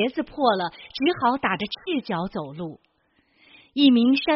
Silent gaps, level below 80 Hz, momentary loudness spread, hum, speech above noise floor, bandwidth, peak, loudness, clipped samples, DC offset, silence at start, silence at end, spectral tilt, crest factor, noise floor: none; -60 dBFS; 15 LU; none; 44 dB; 5.8 kHz; -6 dBFS; -23 LUFS; under 0.1%; under 0.1%; 0 s; 0 s; -3 dB/octave; 18 dB; -66 dBFS